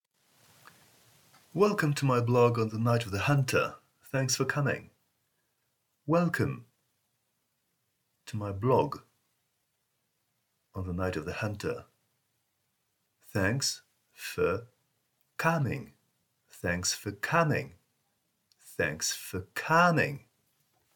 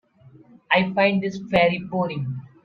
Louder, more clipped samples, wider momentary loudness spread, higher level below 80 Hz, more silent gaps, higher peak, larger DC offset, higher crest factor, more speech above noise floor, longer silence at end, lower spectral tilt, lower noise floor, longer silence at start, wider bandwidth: second, -30 LUFS vs -22 LUFS; neither; first, 15 LU vs 8 LU; second, -64 dBFS vs -58 dBFS; neither; second, -10 dBFS vs -4 dBFS; neither; about the same, 22 dB vs 18 dB; first, 50 dB vs 29 dB; first, 0.8 s vs 0.15 s; second, -5 dB/octave vs -7 dB/octave; first, -79 dBFS vs -51 dBFS; first, 1.55 s vs 0.7 s; first, 19 kHz vs 6.8 kHz